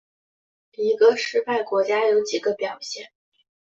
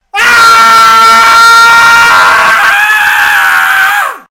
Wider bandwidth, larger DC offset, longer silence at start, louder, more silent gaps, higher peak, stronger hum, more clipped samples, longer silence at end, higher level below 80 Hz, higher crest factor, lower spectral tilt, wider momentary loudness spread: second, 7.8 kHz vs over 20 kHz; neither; first, 0.8 s vs 0.15 s; second, -22 LUFS vs -3 LUFS; neither; second, -4 dBFS vs 0 dBFS; neither; second, under 0.1% vs 10%; first, 0.65 s vs 0.15 s; second, -72 dBFS vs -40 dBFS; first, 18 dB vs 4 dB; first, -2.5 dB/octave vs 0.5 dB/octave; first, 13 LU vs 4 LU